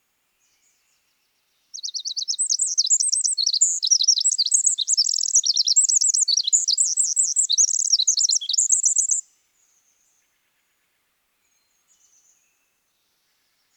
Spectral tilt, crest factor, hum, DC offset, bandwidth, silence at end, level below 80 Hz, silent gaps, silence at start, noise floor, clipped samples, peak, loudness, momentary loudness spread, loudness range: 9 dB/octave; 18 dB; none; under 0.1%; 20 kHz; 4.55 s; under -90 dBFS; none; 1.75 s; -70 dBFS; under 0.1%; -6 dBFS; -17 LUFS; 7 LU; 6 LU